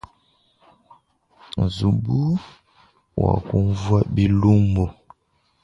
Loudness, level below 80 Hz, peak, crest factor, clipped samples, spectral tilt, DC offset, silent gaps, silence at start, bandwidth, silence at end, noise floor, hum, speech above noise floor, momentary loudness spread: -21 LUFS; -38 dBFS; -2 dBFS; 18 dB; under 0.1%; -8.5 dB/octave; under 0.1%; none; 1.55 s; 7.6 kHz; 0.7 s; -66 dBFS; none; 47 dB; 10 LU